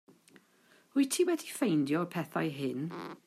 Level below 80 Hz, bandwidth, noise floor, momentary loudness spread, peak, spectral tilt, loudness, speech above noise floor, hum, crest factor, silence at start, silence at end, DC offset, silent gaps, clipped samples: -82 dBFS; 15.5 kHz; -65 dBFS; 7 LU; -18 dBFS; -5 dB/octave; -32 LUFS; 33 dB; none; 16 dB; 0.95 s; 0.1 s; under 0.1%; none; under 0.1%